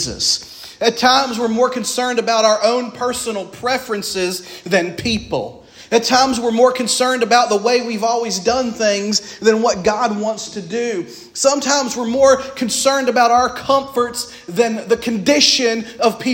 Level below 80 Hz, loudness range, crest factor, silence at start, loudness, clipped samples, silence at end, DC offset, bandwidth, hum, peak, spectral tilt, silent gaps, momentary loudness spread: -50 dBFS; 3 LU; 16 dB; 0 s; -16 LUFS; under 0.1%; 0 s; under 0.1%; 16.5 kHz; none; 0 dBFS; -2.5 dB/octave; none; 9 LU